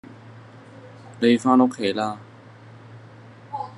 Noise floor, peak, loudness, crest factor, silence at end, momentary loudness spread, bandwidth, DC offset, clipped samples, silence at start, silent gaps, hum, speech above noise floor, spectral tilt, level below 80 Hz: -45 dBFS; -4 dBFS; -21 LUFS; 22 dB; 0.05 s; 27 LU; 11 kHz; under 0.1%; under 0.1%; 0.1 s; none; none; 26 dB; -6 dB/octave; -72 dBFS